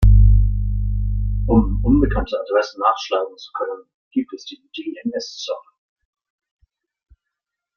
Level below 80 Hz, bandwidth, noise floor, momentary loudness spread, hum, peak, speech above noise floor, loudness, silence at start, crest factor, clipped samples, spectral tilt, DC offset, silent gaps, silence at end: -22 dBFS; 6.8 kHz; -83 dBFS; 15 LU; none; -2 dBFS; 59 dB; -20 LUFS; 0 s; 16 dB; under 0.1%; -7.5 dB/octave; under 0.1%; 3.94-4.11 s; 2.15 s